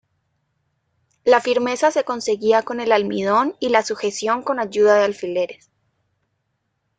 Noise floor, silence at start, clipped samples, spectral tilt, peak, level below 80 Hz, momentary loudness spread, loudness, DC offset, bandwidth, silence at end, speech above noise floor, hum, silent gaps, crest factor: -73 dBFS; 1.25 s; under 0.1%; -3.5 dB/octave; -2 dBFS; -66 dBFS; 8 LU; -19 LUFS; under 0.1%; 9.4 kHz; 1.45 s; 54 dB; none; none; 18 dB